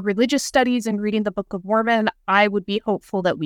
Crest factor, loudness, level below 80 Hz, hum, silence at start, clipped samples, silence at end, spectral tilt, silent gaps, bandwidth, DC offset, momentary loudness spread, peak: 18 dB; -21 LUFS; -56 dBFS; none; 0 s; under 0.1%; 0 s; -4.5 dB/octave; none; 16.5 kHz; under 0.1%; 6 LU; -2 dBFS